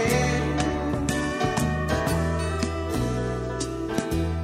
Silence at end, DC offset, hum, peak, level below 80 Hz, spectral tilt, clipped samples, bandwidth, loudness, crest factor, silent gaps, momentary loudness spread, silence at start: 0 s; under 0.1%; none; -8 dBFS; -34 dBFS; -5.5 dB/octave; under 0.1%; 16 kHz; -26 LUFS; 16 dB; none; 4 LU; 0 s